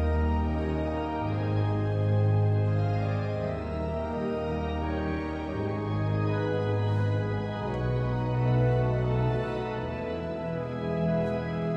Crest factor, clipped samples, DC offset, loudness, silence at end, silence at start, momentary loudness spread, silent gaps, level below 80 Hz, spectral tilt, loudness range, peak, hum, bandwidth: 12 dB; under 0.1%; under 0.1%; -29 LUFS; 0 s; 0 s; 7 LU; none; -42 dBFS; -9 dB/octave; 3 LU; -14 dBFS; none; 6 kHz